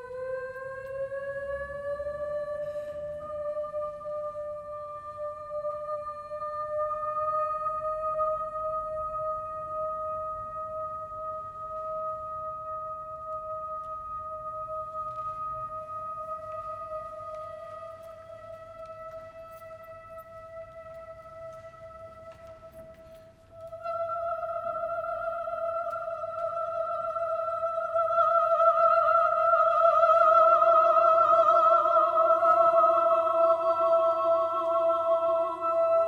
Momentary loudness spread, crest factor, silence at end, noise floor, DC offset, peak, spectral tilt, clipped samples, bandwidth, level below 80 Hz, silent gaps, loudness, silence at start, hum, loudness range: 23 LU; 18 dB; 0 s; -51 dBFS; under 0.1%; -10 dBFS; -6 dB/octave; under 0.1%; 6.4 kHz; -62 dBFS; none; -27 LUFS; 0 s; none; 23 LU